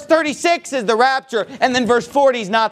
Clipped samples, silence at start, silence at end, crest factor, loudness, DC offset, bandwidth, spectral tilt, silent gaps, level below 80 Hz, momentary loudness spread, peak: under 0.1%; 0 s; 0 s; 16 dB; -16 LUFS; under 0.1%; 14.5 kHz; -3.5 dB/octave; none; -60 dBFS; 4 LU; 0 dBFS